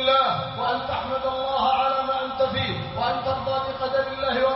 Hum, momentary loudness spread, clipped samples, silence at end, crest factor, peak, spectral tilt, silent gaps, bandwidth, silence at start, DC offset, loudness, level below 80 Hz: none; 6 LU; under 0.1%; 0 s; 16 dB; -8 dBFS; -8.5 dB/octave; none; 5.8 kHz; 0 s; under 0.1%; -24 LUFS; -48 dBFS